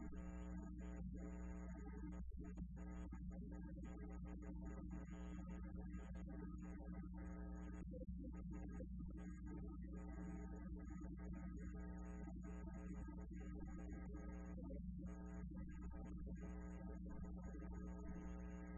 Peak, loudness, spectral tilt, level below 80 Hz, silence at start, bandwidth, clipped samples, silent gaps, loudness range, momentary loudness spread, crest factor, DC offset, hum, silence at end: -40 dBFS; -54 LUFS; -8.5 dB/octave; -54 dBFS; 0 s; 7.4 kHz; under 0.1%; none; 0 LU; 1 LU; 12 dB; under 0.1%; none; 0 s